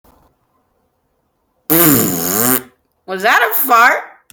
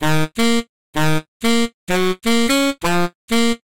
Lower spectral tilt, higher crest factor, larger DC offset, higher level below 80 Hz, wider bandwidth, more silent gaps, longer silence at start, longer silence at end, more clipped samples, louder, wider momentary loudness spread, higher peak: second, -3 dB/octave vs -4.5 dB/octave; about the same, 16 dB vs 12 dB; second, under 0.1% vs 6%; second, -54 dBFS vs -40 dBFS; first, over 20 kHz vs 17 kHz; second, none vs 0.69-0.93 s, 1.28-1.40 s, 1.74-1.87 s, 3.15-3.28 s; first, 1.7 s vs 0 s; first, 0.25 s vs 0.1 s; neither; first, -11 LUFS vs -19 LUFS; first, 10 LU vs 5 LU; first, 0 dBFS vs -6 dBFS